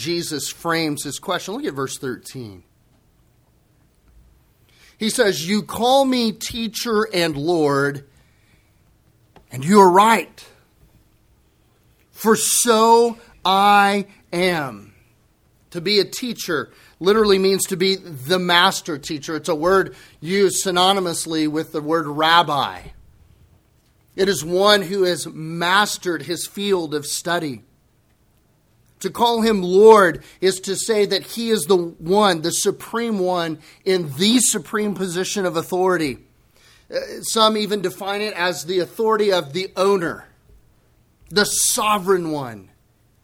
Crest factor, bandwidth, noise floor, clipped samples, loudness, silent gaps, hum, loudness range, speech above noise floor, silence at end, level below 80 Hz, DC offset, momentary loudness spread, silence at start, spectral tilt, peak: 20 dB; 17 kHz; -59 dBFS; under 0.1%; -19 LUFS; none; none; 6 LU; 40 dB; 0.6 s; -56 dBFS; under 0.1%; 13 LU; 0 s; -3.5 dB/octave; 0 dBFS